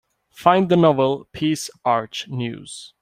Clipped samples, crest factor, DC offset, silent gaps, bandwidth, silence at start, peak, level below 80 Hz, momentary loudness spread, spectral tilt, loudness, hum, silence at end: under 0.1%; 20 dB; under 0.1%; none; 16 kHz; 0.4 s; -2 dBFS; -58 dBFS; 13 LU; -6 dB/octave; -20 LUFS; none; 0.15 s